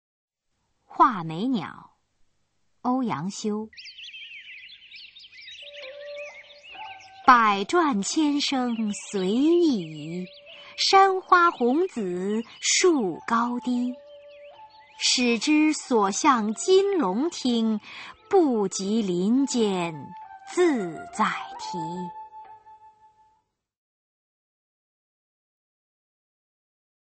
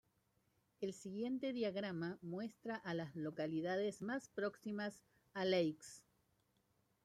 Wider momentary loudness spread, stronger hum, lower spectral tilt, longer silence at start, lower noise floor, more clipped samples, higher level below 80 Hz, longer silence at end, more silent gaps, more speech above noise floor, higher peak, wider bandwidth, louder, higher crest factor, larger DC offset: first, 21 LU vs 9 LU; neither; second, -3.5 dB/octave vs -5.5 dB/octave; about the same, 0.9 s vs 0.8 s; second, -75 dBFS vs -80 dBFS; neither; first, -70 dBFS vs -84 dBFS; first, 4.35 s vs 1.05 s; neither; first, 51 dB vs 38 dB; first, -2 dBFS vs -24 dBFS; second, 8.8 kHz vs 14 kHz; first, -23 LUFS vs -43 LUFS; about the same, 24 dB vs 20 dB; neither